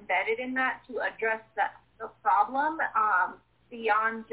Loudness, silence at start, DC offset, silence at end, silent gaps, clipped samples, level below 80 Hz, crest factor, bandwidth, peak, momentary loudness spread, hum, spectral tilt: -28 LUFS; 0 s; under 0.1%; 0.1 s; none; under 0.1%; -72 dBFS; 18 dB; 4 kHz; -12 dBFS; 8 LU; none; -0.5 dB/octave